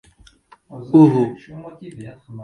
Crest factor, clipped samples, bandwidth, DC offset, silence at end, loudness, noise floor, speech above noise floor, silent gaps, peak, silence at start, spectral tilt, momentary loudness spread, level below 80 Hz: 18 dB; under 0.1%; 9.2 kHz; under 0.1%; 0 s; -15 LUFS; -50 dBFS; 32 dB; none; 0 dBFS; 0.75 s; -10 dB/octave; 25 LU; -58 dBFS